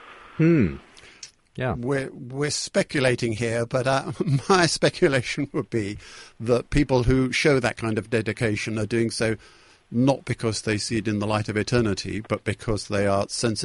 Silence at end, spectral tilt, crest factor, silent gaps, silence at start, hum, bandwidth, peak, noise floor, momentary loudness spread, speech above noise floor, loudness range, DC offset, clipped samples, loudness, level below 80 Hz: 0 s; -5 dB/octave; 20 dB; none; 0 s; none; 11.5 kHz; -4 dBFS; -47 dBFS; 10 LU; 24 dB; 3 LU; under 0.1%; under 0.1%; -24 LUFS; -42 dBFS